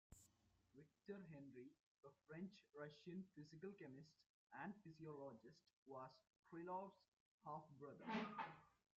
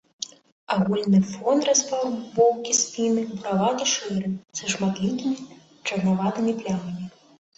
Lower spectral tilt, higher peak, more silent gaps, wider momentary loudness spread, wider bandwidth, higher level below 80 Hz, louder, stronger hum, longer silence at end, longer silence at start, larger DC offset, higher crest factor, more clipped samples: about the same, -5 dB/octave vs -4 dB/octave; second, -36 dBFS vs -6 dBFS; first, 1.80-1.95 s, 4.26-4.47 s, 5.73-5.86 s, 6.39-6.43 s, 7.08-7.12 s, 7.20-7.38 s vs 0.52-0.67 s; about the same, 12 LU vs 12 LU; second, 7.2 kHz vs 8.2 kHz; second, -86 dBFS vs -64 dBFS; second, -57 LUFS vs -24 LUFS; neither; second, 0.3 s vs 0.5 s; about the same, 0.1 s vs 0.2 s; neither; about the same, 22 dB vs 18 dB; neither